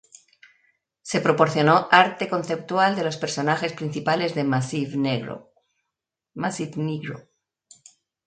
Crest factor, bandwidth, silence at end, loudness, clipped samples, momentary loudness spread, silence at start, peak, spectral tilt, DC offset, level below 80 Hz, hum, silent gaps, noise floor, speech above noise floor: 24 dB; 9.4 kHz; 1.05 s; -22 LUFS; under 0.1%; 16 LU; 1.05 s; 0 dBFS; -5 dB/octave; under 0.1%; -66 dBFS; none; none; -84 dBFS; 62 dB